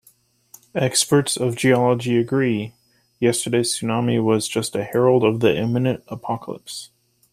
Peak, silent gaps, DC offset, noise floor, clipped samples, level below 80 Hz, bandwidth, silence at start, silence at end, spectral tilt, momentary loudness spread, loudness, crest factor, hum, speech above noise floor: -2 dBFS; none; under 0.1%; -58 dBFS; under 0.1%; -60 dBFS; 15.5 kHz; 0.75 s; 0.45 s; -5 dB/octave; 12 LU; -20 LUFS; 18 dB; none; 38 dB